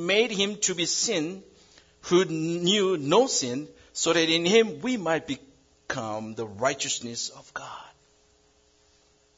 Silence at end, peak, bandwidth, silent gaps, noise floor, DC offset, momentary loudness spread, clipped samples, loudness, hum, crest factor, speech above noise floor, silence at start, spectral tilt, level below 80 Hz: 1.5 s; -6 dBFS; 7.8 kHz; none; -63 dBFS; under 0.1%; 16 LU; under 0.1%; -25 LUFS; none; 20 dB; 37 dB; 0 s; -3 dB/octave; -66 dBFS